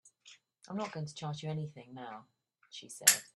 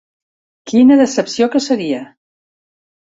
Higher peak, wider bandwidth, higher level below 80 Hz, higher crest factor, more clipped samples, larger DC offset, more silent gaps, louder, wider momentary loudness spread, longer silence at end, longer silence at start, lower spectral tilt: about the same, -4 dBFS vs -2 dBFS; first, 13 kHz vs 8 kHz; second, -80 dBFS vs -58 dBFS; first, 34 dB vs 14 dB; neither; neither; neither; second, -33 LUFS vs -14 LUFS; first, 23 LU vs 11 LU; second, 0.1 s vs 1.1 s; second, 0.05 s vs 0.65 s; second, -2 dB/octave vs -4.5 dB/octave